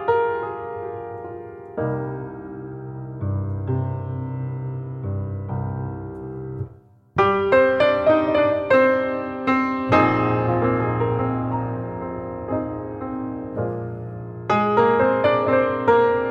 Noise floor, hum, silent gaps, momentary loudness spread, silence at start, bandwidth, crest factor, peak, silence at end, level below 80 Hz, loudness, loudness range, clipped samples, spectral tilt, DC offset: -47 dBFS; none; none; 16 LU; 0 s; 7.4 kHz; 20 dB; -2 dBFS; 0 s; -50 dBFS; -22 LUFS; 10 LU; under 0.1%; -8.5 dB/octave; under 0.1%